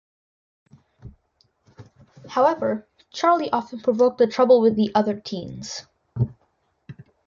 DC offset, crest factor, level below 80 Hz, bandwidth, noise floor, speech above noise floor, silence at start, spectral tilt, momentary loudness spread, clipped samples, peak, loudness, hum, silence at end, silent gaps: under 0.1%; 18 dB; -56 dBFS; 7.4 kHz; -68 dBFS; 47 dB; 1.05 s; -6.5 dB/octave; 17 LU; under 0.1%; -4 dBFS; -21 LUFS; none; 0.35 s; none